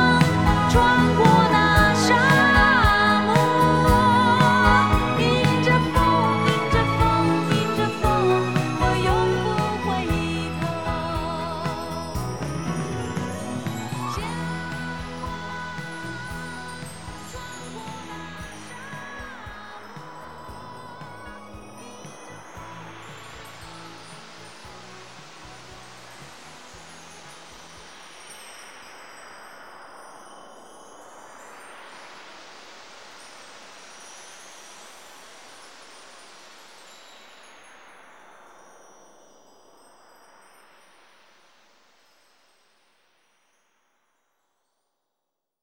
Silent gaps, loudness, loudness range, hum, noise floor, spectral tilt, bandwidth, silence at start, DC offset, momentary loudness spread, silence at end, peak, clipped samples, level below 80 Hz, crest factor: none; -21 LUFS; 26 LU; none; -83 dBFS; -5.5 dB/octave; 19 kHz; 0 s; 0.3%; 26 LU; 9.65 s; -2 dBFS; under 0.1%; -38 dBFS; 22 dB